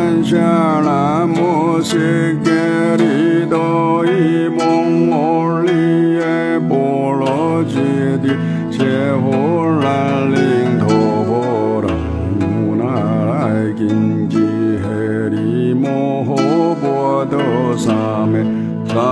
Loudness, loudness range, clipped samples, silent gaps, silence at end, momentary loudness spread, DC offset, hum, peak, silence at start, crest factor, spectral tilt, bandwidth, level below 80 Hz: -15 LUFS; 2 LU; under 0.1%; none; 0 s; 4 LU; under 0.1%; none; -2 dBFS; 0 s; 12 dB; -7.5 dB/octave; 11 kHz; -42 dBFS